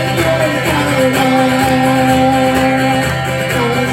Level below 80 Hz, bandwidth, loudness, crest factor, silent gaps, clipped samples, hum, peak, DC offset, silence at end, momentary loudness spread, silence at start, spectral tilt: -36 dBFS; 16.5 kHz; -12 LUFS; 12 dB; none; under 0.1%; none; 0 dBFS; under 0.1%; 0 s; 4 LU; 0 s; -5 dB/octave